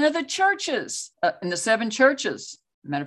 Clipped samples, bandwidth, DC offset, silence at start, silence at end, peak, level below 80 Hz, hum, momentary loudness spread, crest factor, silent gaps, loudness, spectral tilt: under 0.1%; 12.5 kHz; under 0.1%; 0 s; 0 s; -4 dBFS; -74 dBFS; none; 14 LU; 20 dB; 2.74-2.82 s; -23 LUFS; -3 dB/octave